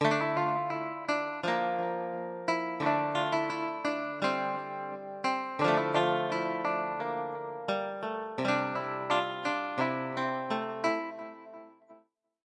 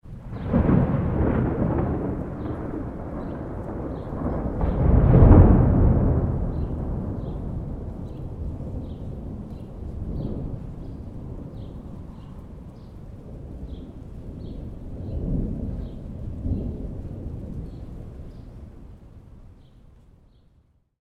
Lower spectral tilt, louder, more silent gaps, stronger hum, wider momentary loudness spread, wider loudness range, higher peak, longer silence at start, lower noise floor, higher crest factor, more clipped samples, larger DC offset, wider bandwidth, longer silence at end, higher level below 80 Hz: second, -5.5 dB/octave vs -11.5 dB/octave; second, -32 LUFS vs -24 LUFS; neither; neither; second, 8 LU vs 21 LU; second, 2 LU vs 20 LU; second, -12 dBFS vs 0 dBFS; about the same, 0 s vs 0.05 s; about the same, -63 dBFS vs -61 dBFS; about the same, 20 dB vs 24 dB; neither; neither; first, 10 kHz vs 4.2 kHz; second, 0.5 s vs 1.4 s; second, -82 dBFS vs -30 dBFS